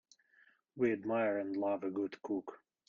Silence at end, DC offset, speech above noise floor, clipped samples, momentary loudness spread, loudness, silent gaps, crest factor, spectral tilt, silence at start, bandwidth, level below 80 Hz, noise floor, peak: 0.3 s; under 0.1%; 33 dB; under 0.1%; 7 LU; -37 LUFS; none; 16 dB; -7.5 dB/octave; 0.75 s; 7.2 kHz; -78 dBFS; -69 dBFS; -20 dBFS